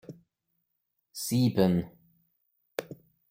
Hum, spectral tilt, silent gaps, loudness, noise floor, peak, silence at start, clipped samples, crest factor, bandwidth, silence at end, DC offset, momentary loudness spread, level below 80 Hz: none; -6 dB/octave; none; -29 LUFS; -81 dBFS; -10 dBFS; 0.1 s; under 0.1%; 22 dB; 16.5 kHz; 0.35 s; under 0.1%; 25 LU; -64 dBFS